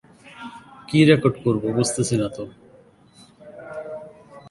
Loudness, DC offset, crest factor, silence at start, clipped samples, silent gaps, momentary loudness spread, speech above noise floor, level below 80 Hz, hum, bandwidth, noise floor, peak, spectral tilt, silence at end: -20 LUFS; under 0.1%; 22 dB; 0.25 s; under 0.1%; none; 24 LU; 33 dB; -56 dBFS; none; 11.5 kHz; -52 dBFS; -2 dBFS; -5.5 dB/octave; 0 s